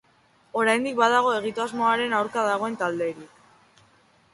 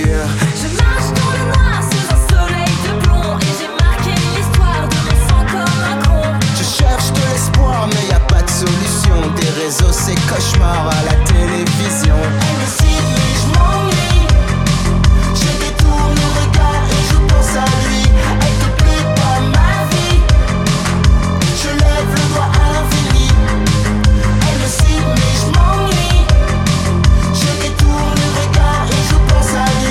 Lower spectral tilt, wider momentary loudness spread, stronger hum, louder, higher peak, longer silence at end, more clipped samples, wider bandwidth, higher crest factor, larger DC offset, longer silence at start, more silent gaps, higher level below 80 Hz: second, -3.5 dB/octave vs -5 dB/octave; first, 10 LU vs 3 LU; neither; second, -24 LUFS vs -13 LUFS; second, -6 dBFS vs 0 dBFS; first, 1.05 s vs 0 s; neither; second, 11.5 kHz vs 15.5 kHz; first, 20 dB vs 12 dB; neither; first, 0.55 s vs 0 s; neither; second, -70 dBFS vs -14 dBFS